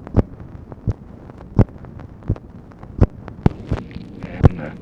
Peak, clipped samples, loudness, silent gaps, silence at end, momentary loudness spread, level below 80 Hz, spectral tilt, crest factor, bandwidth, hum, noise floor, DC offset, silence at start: 0 dBFS; under 0.1%; -22 LUFS; none; 0 s; 20 LU; -28 dBFS; -10 dB/octave; 20 dB; 6.2 kHz; none; -39 dBFS; under 0.1%; 0.05 s